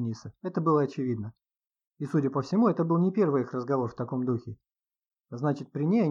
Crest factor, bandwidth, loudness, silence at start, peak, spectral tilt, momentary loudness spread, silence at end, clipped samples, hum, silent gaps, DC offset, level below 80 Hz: 16 dB; 7.4 kHz; -28 LUFS; 0 s; -14 dBFS; -9 dB/octave; 11 LU; 0 s; under 0.1%; none; 1.87-1.91 s; under 0.1%; -70 dBFS